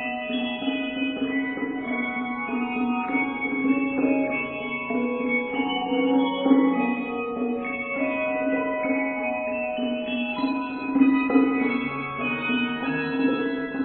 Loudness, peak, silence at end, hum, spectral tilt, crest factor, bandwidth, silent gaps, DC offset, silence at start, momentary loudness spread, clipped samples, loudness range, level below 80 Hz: -25 LUFS; -6 dBFS; 0 s; none; -9.5 dB/octave; 18 dB; 4.3 kHz; none; under 0.1%; 0 s; 7 LU; under 0.1%; 3 LU; -60 dBFS